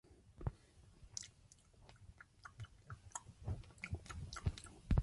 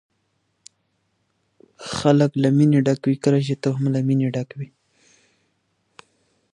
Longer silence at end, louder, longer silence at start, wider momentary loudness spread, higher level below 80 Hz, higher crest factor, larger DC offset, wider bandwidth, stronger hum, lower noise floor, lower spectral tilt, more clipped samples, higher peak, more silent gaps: second, 0 s vs 1.9 s; second, -49 LUFS vs -20 LUFS; second, 0.05 s vs 1.8 s; first, 20 LU vs 16 LU; first, -50 dBFS vs -60 dBFS; about the same, 24 dB vs 20 dB; neither; about the same, 11.5 kHz vs 11 kHz; neither; about the same, -67 dBFS vs -70 dBFS; second, -5 dB/octave vs -7.5 dB/octave; neither; second, -22 dBFS vs -2 dBFS; neither